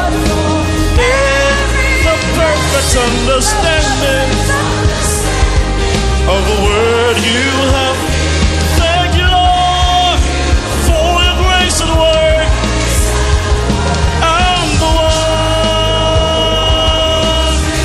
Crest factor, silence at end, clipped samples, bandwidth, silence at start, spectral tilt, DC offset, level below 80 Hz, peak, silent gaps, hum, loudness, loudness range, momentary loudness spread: 10 dB; 0 s; under 0.1%; 14 kHz; 0 s; -4 dB/octave; under 0.1%; -16 dBFS; 0 dBFS; none; none; -11 LUFS; 1 LU; 3 LU